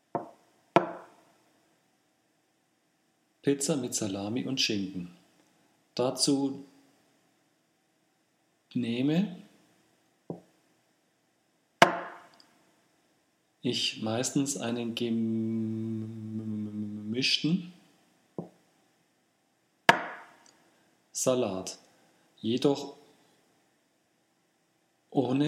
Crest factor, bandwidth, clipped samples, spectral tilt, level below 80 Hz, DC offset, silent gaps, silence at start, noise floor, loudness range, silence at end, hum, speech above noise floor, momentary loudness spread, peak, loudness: 32 dB; 16 kHz; under 0.1%; -4 dB/octave; -82 dBFS; under 0.1%; none; 0.15 s; -72 dBFS; 5 LU; 0 s; none; 43 dB; 20 LU; 0 dBFS; -30 LUFS